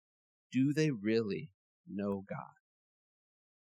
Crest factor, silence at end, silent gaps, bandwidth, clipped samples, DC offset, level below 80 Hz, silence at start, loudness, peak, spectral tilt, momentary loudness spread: 18 dB; 1.2 s; 1.54-1.84 s; 12 kHz; under 0.1%; under 0.1%; -82 dBFS; 0.5 s; -35 LUFS; -20 dBFS; -7 dB/octave; 15 LU